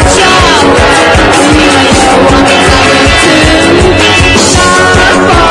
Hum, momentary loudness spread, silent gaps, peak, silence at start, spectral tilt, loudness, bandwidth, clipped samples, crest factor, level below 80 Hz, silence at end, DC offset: none; 1 LU; none; 0 dBFS; 0 s; -3.5 dB/octave; -4 LUFS; 12 kHz; 9%; 4 dB; -18 dBFS; 0 s; under 0.1%